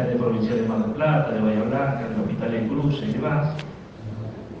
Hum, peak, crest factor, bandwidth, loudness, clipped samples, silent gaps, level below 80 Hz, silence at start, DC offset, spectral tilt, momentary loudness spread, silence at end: none; -10 dBFS; 14 dB; 7 kHz; -24 LUFS; under 0.1%; none; -50 dBFS; 0 s; under 0.1%; -9 dB/octave; 13 LU; 0 s